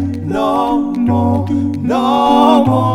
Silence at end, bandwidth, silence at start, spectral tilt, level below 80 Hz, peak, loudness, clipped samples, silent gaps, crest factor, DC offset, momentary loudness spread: 0 s; 13.5 kHz; 0 s; -7.5 dB/octave; -40 dBFS; 0 dBFS; -13 LUFS; under 0.1%; none; 12 dB; under 0.1%; 7 LU